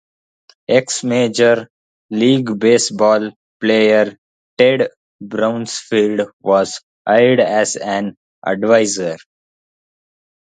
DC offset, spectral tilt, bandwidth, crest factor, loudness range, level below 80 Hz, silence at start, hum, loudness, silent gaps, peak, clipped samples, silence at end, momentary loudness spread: under 0.1%; -4 dB/octave; 9.4 kHz; 16 dB; 2 LU; -64 dBFS; 0.7 s; none; -15 LUFS; 1.70-2.09 s, 3.36-3.60 s, 4.18-4.57 s, 4.96-5.19 s, 6.33-6.40 s, 6.83-7.05 s, 8.17-8.42 s; 0 dBFS; under 0.1%; 1.3 s; 12 LU